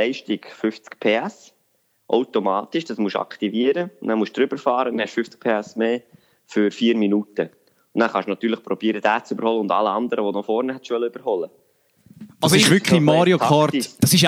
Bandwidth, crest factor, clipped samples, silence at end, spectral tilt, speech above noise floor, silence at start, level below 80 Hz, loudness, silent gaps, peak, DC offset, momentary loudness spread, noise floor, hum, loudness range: 16.5 kHz; 20 dB; under 0.1%; 0 s; -4.5 dB/octave; 46 dB; 0 s; -62 dBFS; -21 LUFS; none; -2 dBFS; under 0.1%; 11 LU; -66 dBFS; none; 5 LU